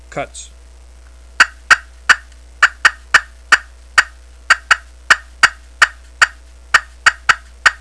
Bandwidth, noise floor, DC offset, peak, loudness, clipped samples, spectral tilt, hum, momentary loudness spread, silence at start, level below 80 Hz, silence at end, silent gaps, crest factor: 11 kHz; -40 dBFS; 0.3%; 0 dBFS; -14 LUFS; 0.5%; 0.5 dB/octave; none; 4 LU; 0.15 s; -40 dBFS; 0.1 s; none; 16 dB